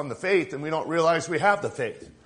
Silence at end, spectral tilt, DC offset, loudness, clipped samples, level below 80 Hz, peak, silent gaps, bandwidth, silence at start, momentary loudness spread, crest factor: 0.15 s; -5 dB/octave; under 0.1%; -25 LUFS; under 0.1%; -64 dBFS; -6 dBFS; none; 10.5 kHz; 0 s; 8 LU; 20 dB